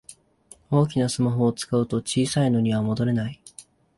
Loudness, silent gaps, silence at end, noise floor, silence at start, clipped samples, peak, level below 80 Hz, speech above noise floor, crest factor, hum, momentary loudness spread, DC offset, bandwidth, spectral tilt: -23 LUFS; none; 0.35 s; -53 dBFS; 0.1 s; under 0.1%; -6 dBFS; -56 dBFS; 31 dB; 16 dB; none; 6 LU; under 0.1%; 11.5 kHz; -6 dB/octave